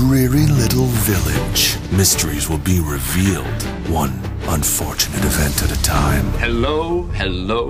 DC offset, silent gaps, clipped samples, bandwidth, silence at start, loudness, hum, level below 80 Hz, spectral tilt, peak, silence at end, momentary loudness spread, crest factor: under 0.1%; none; under 0.1%; 16 kHz; 0 s; -17 LUFS; none; -24 dBFS; -4.5 dB/octave; -2 dBFS; 0 s; 7 LU; 14 dB